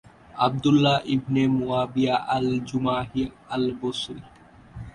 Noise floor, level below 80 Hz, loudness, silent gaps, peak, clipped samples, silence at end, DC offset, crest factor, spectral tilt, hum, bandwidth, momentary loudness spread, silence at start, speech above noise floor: -43 dBFS; -52 dBFS; -24 LUFS; none; -6 dBFS; under 0.1%; 0.05 s; under 0.1%; 18 dB; -6.5 dB/octave; none; 11 kHz; 11 LU; 0.35 s; 19 dB